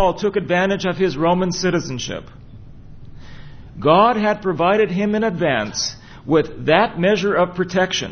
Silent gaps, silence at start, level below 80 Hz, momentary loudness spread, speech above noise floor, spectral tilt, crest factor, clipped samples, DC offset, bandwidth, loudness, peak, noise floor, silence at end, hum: none; 0 s; -46 dBFS; 8 LU; 20 dB; -5 dB/octave; 18 dB; under 0.1%; under 0.1%; 6.6 kHz; -18 LUFS; 0 dBFS; -38 dBFS; 0 s; none